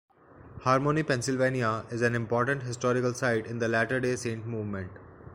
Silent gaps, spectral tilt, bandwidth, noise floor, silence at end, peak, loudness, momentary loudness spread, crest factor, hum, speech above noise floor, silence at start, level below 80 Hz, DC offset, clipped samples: none; -5.5 dB/octave; 15 kHz; -49 dBFS; 0 s; -8 dBFS; -28 LUFS; 8 LU; 20 dB; none; 21 dB; 0.4 s; -60 dBFS; under 0.1%; under 0.1%